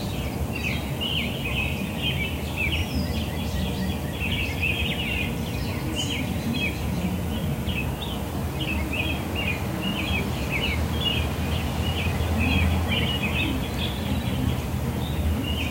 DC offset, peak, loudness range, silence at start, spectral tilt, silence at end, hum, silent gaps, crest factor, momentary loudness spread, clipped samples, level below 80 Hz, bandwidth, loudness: under 0.1%; -10 dBFS; 3 LU; 0 s; -5 dB/octave; 0 s; none; none; 16 dB; 4 LU; under 0.1%; -34 dBFS; 16 kHz; -26 LUFS